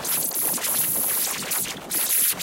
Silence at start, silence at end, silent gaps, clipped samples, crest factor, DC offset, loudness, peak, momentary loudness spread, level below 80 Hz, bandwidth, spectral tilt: 0 s; 0 s; none; under 0.1%; 16 dB; under 0.1%; -21 LUFS; -8 dBFS; 6 LU; -60 dBFS; 17.5 kHz; 0 dB/octave